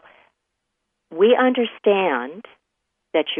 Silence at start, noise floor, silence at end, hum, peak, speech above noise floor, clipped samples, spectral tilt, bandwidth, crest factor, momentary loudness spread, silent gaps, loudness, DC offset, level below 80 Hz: 1.1 s; -77 dBFS; 0 s; none; -4 dBFS; 59 dB; under 0.1%; -8 dB/octave; 3.7 kHz; 18 dB; 14 LU; none; -19 LUFS; under 0.1%; -76 dBFS